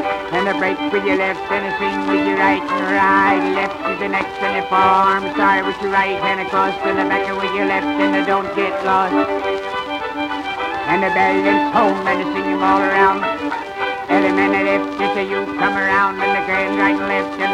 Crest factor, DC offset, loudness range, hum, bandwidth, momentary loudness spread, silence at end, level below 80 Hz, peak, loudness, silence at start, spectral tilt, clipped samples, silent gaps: 14 dB; under 0.1%; 2 LU; none; 11.5 kHz; 7 LU; 0 s; -50 dBFS; -2 dBFS; -17 LUFS; 0 s; -5.5 dB/octave; under 0.1%; none